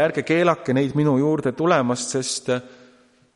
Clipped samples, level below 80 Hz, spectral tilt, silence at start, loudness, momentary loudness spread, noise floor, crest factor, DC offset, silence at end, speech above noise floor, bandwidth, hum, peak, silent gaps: under 0.1%; -62 dBFS; -5 dB/octave; 0 s; -21 LUFS; 5 LU; -55 dBFS; 16 dB; under 0.1%; 0.7 s; 34 dB; 11.5 kHz; none; -4 dBFS; none